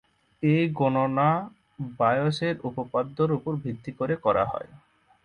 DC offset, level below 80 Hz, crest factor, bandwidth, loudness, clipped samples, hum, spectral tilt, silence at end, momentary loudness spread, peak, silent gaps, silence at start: under 0.1%; -58 dBFS; 18 dB; 10 kHz; -26 LUFS; under 0.1%; none; -8 dB/octave; 0.5 s; 13 LU; -8 dBFS; none; 0.4 s